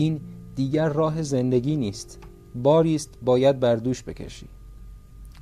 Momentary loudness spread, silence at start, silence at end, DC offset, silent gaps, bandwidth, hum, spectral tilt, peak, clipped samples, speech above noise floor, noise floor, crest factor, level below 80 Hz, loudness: 19 LU; 0 s; 0 s; under 0.1%; none; 13.5 kHz; none; -7 dB/octave; -6 dBFS; under 0.1%; 20 dB; -43 dBFS; 18 dB; -46 dBFS; -23 LUFS